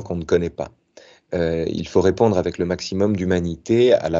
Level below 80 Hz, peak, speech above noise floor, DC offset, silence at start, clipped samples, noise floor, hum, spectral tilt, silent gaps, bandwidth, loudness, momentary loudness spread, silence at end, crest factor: -44 dBFS; -4 dBFS; 30 dB; under 0.1%; 0 s; under 0.1%; -50 dBFS; none; -6.5 dB/octave; none; 7.8 kHz; -20 LUFS; 10 LU; 0 s; 16 dB